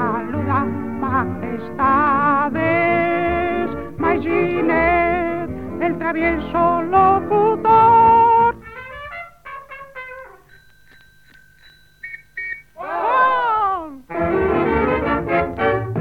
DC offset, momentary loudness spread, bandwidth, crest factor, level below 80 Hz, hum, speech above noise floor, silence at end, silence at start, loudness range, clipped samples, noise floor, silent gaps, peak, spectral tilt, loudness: 0.6%; 19 LU; 5.2 kHz; 16 dB; -40 dBFS; none; 34 dB; 0 s; 0 s; 19 LU; under 0.1%; -50 dBFS; none; -4 dBFS; -8.5 dB/octave; -17 LUFS